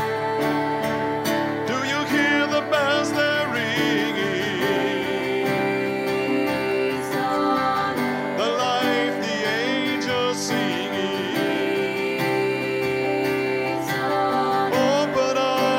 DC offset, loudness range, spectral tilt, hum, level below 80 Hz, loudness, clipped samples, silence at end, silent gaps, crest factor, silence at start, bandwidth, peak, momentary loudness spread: under 0.1%; 2 LU; -4.5 dB/octave; none; -64 dBFS; -22 LUFS; under 0.1%; 0 s; none; 14 dB; 0 s; 16.5 kHz; -8 dBFS; 4 LU